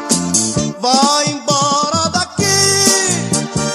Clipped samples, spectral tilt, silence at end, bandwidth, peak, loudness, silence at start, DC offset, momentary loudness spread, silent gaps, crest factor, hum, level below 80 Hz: under 0.1%; -2.5 dB/octave; 0 s; 16 kHz; 0 dBFS; -13 LUFS; 0 s; under 0.1%; 6 LU; none; 14 dB; none; -46 dBFS